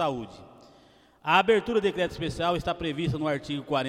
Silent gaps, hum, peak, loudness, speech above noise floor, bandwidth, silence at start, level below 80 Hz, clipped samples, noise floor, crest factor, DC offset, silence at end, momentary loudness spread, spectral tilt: none; none; -8 dBFS; -27 LUFS; 31 dB; 14 kHz; 0 s; -52 dBFS; under 0.1%; -58 dBFS; 20 dB; under 0.1%; 0 s; 11 LU; -6 dB/octave